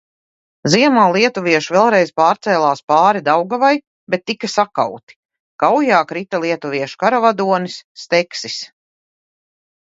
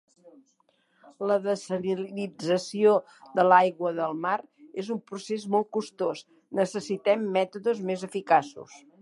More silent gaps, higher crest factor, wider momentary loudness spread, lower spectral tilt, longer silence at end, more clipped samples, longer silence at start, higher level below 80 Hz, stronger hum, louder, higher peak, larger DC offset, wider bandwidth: first, 2.83-2.88 s, 3.87-4.07 s, 5.03-5.07 s, 5.16-5.29 s, 5.40-5.59 s, 7.84-7.95 s vs none; second, 16 dB vs 22 dB; about the same, 10 LU vs 12 LU; about the same, -4.5 dB/octave vs -5.5 dB/octave; first, 1.35 s vs 0.25 s; neither; second, 0.65 s vs 1.05 s; first, -64 dBFS vs -78 dBFS; neither; first, -15 LUFS vs -27 LUFS; first, 0 dBFS vs -6 dBFS; neither; second, 8 kHz vs 11.5 kHz